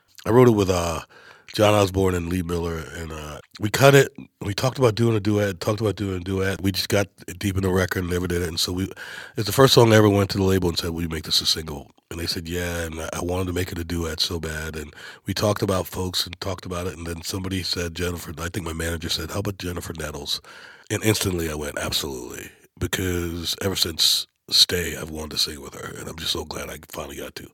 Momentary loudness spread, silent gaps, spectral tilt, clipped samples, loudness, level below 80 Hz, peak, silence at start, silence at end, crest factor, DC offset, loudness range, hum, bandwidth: 17 LU; none; -4.5 dB/octave; under 0.1%; -23 LUFS; -44 dBFS; 0 dBFS; 0.25 s; 0.05 s; 24 dB; under 0.1%; 8 LU; none; 17.5 kHz